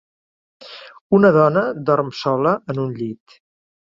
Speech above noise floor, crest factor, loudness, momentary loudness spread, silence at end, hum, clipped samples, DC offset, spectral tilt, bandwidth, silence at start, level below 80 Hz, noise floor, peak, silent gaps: over 73 dB; 18 dB; -18 LUFS; 24 LU; 0.85 s; none; under 0.1%; under 0.1%; -8 dB/octave; 7.4 kHz; 0.65 s; -62 dBFS; under -90 dBFS; 0 dBFS; 1.01-1.10 s